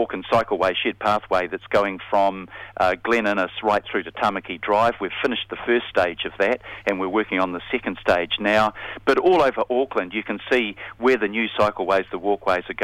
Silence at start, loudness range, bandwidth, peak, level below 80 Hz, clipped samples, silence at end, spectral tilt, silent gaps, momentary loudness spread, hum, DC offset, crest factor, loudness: 0 s; 2 LU; 14 kHz; -4 dBFS; -52 dBFS; under 0.1%; 0 s; -5 dB/octave; none; 6 LU; none; under 0.1%; 18 dB; -22 LUFS